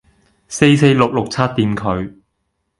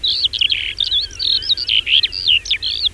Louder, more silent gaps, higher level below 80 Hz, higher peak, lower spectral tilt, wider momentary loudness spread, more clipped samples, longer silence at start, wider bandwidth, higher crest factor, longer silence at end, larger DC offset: about the same, -15 LUFS vs -14 LUFS; neither; about the same, -44 dBFS vs -40 dBFS; about the same, 0 dBFS vs -2 dBFS; first, -6 dB/octave vs 0.5 dB/octave; first, 14 LU vs 4 LU; neither; first, 0.5 s vs 0 s; about the same, 11.5 kHz vs 11 kHz; about the same, 16 dB vs 14 dB; first, 0.7 s vs 0 s; neither